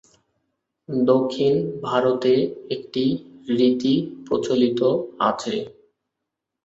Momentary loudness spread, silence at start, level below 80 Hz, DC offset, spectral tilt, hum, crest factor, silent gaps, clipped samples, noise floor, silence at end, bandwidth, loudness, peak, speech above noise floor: 9 LU; 0.9 s; -64 dBFS; under 0.1%; -6.5 dB/octave; none; 18 dB; none; under 0.1%; -83 dBFS; 0.95 s; 8 kHz; -22 LUFS; -4 dBFS; 62 dB